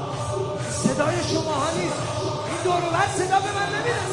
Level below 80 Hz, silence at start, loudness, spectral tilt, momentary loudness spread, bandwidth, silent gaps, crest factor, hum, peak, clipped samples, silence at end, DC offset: -52 dBFS; 0 s; -24 LUFS; -4.5 dB/octave; 5 LU; 11.5 kHz; none; 18 dB; none; -6 dBFS; under 0.1%; 0 s; under 0.1%